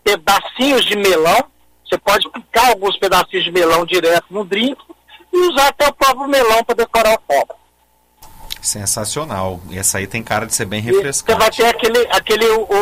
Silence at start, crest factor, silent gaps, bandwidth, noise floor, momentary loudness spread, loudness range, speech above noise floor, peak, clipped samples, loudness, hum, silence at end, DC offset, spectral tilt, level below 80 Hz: 0.05 s; 14 dB; none; 16 kHz; -57 dBFS; 8 LU; 4 LU; 42 dB; -2 dBFS; under 0.1%; -14 LUFS; none; 0 s; under 0.1%; -2.5 dB/octave; -42 dBFS